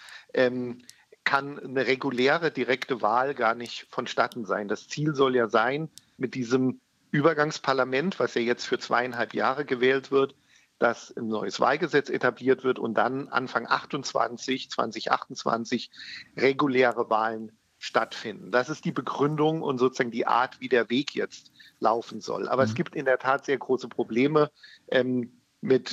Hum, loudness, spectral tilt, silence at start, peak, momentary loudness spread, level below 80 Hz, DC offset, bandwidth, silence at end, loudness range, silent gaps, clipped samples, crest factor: none; -27 LUFS; -5 dB/octave; 0 s; -6 dBFS; 10 LU; -80 dBFS; under 0.1%; 10.5 kHz; 0 s; 1 LU; none; under 0.1%; 22 dB